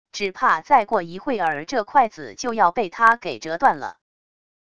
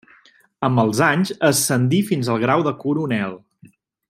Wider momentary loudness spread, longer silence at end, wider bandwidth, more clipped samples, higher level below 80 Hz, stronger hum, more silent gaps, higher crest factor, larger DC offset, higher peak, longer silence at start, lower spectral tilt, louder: first, 11 LU vs 7 LU; about the same, 0.8 s vs 0.7 s; second, 11 kHz vs 16 kHz; neither; about the same, -60 dBFS vs -60 dBFS; neither; neither; about the same, 20 dB vs 18 dB; first, 0.5% vs under 0.1%; about the same, -2 dBFS vs -2 dBFS; second, 0.15 s vs 0.6 s; second, -3.5 dB/octave vs -5 dB/octave; about the same, -21 LUFS vs -19 LUFS